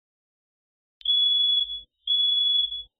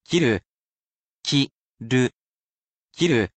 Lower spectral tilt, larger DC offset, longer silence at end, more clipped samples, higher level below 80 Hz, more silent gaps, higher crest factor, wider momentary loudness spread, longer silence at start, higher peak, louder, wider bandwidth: second, 3.5 dB/octave vs -5 dB/octave; neither; about the same, 0.15 s vs 0.1 s; neither; about the same, -60 dBFS vs -58 dBFS; second, none vs 0.46-1.22 s, 1.52-1.75 s, 2.15-2.86 s; second, 10 dB vs 18 dB; first, 11 LU vs 8 LU; first, 1.05 s vs 0.1 s; second, -16 dBFS vs -6 dBFS; about the same, -21 LUFS vs -23 LUFS; second, 4.4 kHz vs 9 kHz